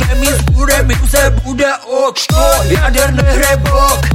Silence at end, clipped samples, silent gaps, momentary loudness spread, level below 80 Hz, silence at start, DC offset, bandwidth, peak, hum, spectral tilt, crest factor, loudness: 0 s; under 0.1%; none; 4 LU; -14 dBFS; 0 s; under 0.1%; 17 kHz; 0 dBFS; none; -4.5 dB/octave; 10 dB; -11 LUFS